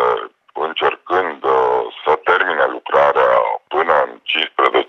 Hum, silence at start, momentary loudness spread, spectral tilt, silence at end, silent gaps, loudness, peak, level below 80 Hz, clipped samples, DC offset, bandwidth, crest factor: none; 0 s; 5 LU; -4.5 dB/octave; 0.05 s; none; -16 LUFS; 0 dBFS; -58 dBFS; under 0.1%; under 0.1%; 6.6 kHz; 16 dB